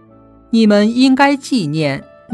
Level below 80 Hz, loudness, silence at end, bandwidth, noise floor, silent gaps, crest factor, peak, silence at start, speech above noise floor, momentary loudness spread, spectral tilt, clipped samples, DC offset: -54 dBFS; -13 LUFS; 0 s; 12 kHz; -44 dBFS; none; 14 dB; 0 dBFS; 0.5 s; 32 dB; 8 LU; -5.5 dB/octave; under 0.1%; under 0.1%